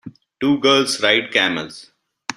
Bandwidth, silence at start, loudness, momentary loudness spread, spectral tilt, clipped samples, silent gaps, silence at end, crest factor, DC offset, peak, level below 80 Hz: 13.5 kHz; 0.05 s; -17 LUFS; 14 LU; -3 dB/octave; under 0.1%; none; 0.05 s; 18 dB; under 0.1%; 0 dBFS; -60 dBFS